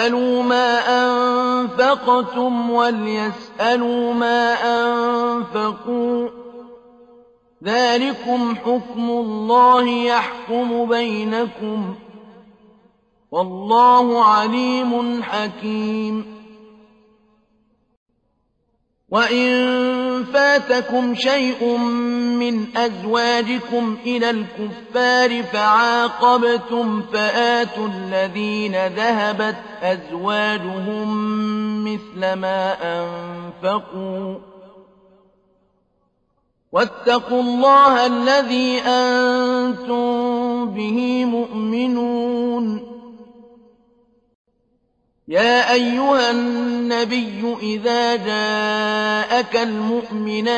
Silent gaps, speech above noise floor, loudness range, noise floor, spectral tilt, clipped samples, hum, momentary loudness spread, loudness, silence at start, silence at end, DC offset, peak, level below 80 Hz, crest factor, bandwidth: 17.97-18.06 s, 44.35-44.45 s; 49 dB; 8 LU; -67 dBFS; -4.5 dB/octave; under 0.1%; none; 10 LU; -18 LUFS; 0 s; 0 s; under 0.1%; -4 dBFS; -62 dBFS; 16 dB; 8.6 kHz